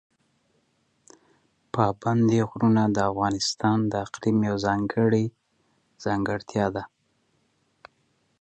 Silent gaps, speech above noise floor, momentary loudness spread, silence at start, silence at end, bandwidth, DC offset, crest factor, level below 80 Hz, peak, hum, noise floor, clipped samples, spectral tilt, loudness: none; 46 dB; 8 LU; 1.75 s; 1.55 s; 8.8 kHz; under 0.1%; 20 dB; -56 dBFS; -8 dBFS; none; -70 dBFS; under 0.1%; -6 dB/octave; -25 LUFS